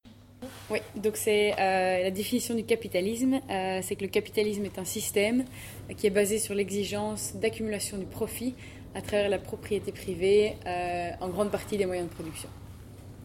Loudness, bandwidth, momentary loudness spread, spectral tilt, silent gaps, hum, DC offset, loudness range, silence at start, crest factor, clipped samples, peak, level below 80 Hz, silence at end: -29 LUFS; 17 kHz; 15 LU; -4 dB/octave; none; none; under 0.1%; 3 LU; 0.05 s; 18 dB; under 0.1%; -12 dBFS; -54 dBFS; 0 s